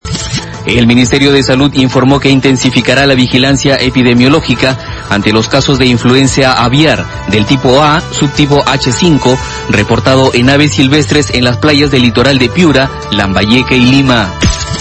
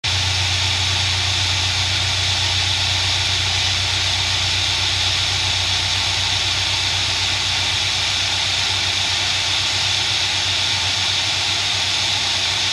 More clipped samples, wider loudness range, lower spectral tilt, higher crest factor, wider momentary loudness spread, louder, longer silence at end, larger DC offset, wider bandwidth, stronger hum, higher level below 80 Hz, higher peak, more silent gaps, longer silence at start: first, 2% vs under 0.1%; about the same, 1 LU vs 0 LU; first, -5 dB/octave vs -1 dB/octave; second, 8 dB vs 14 dB; first, 5 LU vs 1 LU; first, -8 LUFS vs -17 LUFS; about the same, 0 s vs 0 s; neither; second, 11 kHz vs 13 kHz; neither; first, -26 dBFS vs -40 dBFS; first, 0 dBFS vs -6 dBFS; neither; about the same, 0.05 s vs 0.05 s